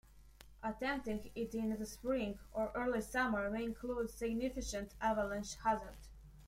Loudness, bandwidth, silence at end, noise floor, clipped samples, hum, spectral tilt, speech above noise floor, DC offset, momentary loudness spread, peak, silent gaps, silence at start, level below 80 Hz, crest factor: -40 LUFS; 16 kHz; 0 s; -60 dBFS; under 0.1%; none; -4.5 dB/octave; 21 dB; under 0.1%; 7 LU; -22 dBFS; none; 0.05 s; -56 dBFS; 18 dB